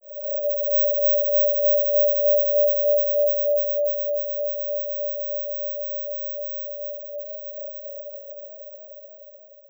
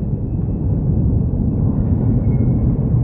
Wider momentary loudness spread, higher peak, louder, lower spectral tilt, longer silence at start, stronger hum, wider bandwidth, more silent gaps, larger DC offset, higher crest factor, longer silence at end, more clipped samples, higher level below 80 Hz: first, 18 LU vs 4 LU; second, -12 dBFS vs -4 dBFS; second, -21 LUFS vs -18 LUFS; second, -7 dB/octave vs -15.5 dB/octave; about the same, 0.05 s vs 0 s; neither; first, over 20 kHz vs 2.3 kHz; neither; neither; about the same, 12 dB vs 12 dB; first, 0.15 s vs 0 s; neither; second, under -90 dBFS vs -22 dBFS